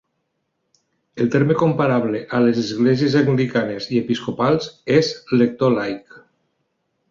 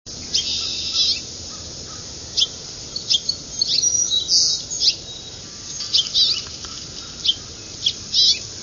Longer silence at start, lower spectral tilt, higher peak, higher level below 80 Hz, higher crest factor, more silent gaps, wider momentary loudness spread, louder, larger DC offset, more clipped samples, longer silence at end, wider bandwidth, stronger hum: first, 1.15 s vs 0.05 s; first, -7 dB/octave vs 0.5 dB/octave; about the same, -2 dBFS vs -4 dBFS; second, -58 dBFS vs -48 dBFS; about the same, 18 dB vs 20 dB; neither; second, 6 LU vs 16 LU; about the same, -19 LUFS vs -18 LUFS; neither; neither; first, 0.9 s vs 0 s; about the same, 7.4 kHz vs 7.4 kHz; neither